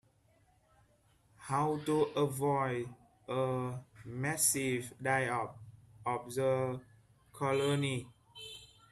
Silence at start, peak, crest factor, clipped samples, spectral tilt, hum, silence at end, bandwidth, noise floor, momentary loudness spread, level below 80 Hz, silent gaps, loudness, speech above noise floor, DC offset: 1.4 s; -16 dBFS; 20 dB; under 0.1%; -4.5 dB/octave; none; 0.25 s; 15 kHz; -69 dBFS; 17 LU; -70 dBFS; none; -34 LUFS; 36 dB; under 0.1%